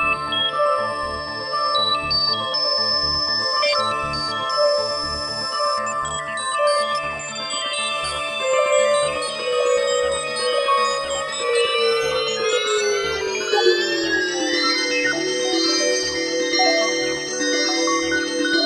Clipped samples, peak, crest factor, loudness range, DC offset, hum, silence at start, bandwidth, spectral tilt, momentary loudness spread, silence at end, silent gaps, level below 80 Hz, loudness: under 0.1%; -4 dBFS; 16 dB; 2 LU; under 0.1%; none; 0 s; 14.5 kHz; -1.5 dB/octave; 6 LU; 0 s; none; -50 dBFS; -20 LUFS